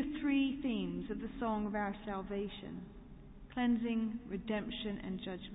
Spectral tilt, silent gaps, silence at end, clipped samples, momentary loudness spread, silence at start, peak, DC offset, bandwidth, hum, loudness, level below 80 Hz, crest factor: -4 dB/octave; none; 0 s; under 0.1%; 14 LU; 0 s; -24 dBFS; under 0.1%; 3.9 kHz; none; -38 LUFS; -56 dBFS; 14 dB